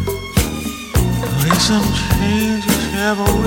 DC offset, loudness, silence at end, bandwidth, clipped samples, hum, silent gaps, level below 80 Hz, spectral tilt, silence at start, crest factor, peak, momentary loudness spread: under 0.1%; -17 LUFS; 0 s; 17 kHz; under 0.1%; none; none; -26 dBFS; -4.5 dB/octave; 0 s; 16 dB; 0 dBFS; 5 LU